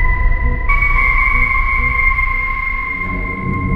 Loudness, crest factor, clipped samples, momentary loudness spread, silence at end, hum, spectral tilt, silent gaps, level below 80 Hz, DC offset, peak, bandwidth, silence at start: -15 LUFS; 14 dB; under 0.1%; 7 LU; 0 s; none; -7.5 dB/octave; none; -18 dBFS; under 0.1%; 0 dBFS; 4.9 kHz; 0 s